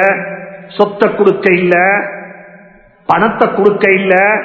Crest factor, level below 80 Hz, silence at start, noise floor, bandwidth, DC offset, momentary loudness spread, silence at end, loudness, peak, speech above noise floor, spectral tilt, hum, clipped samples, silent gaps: 12 dB; -52 dBFS; 0 s; -42 dBFS; 6.6 kHz; under 0.1%; 17 LU; 0 s; -11 LUFS; 0 dBFS; 31 dB; -8 dB/octave; none; 0.4%; none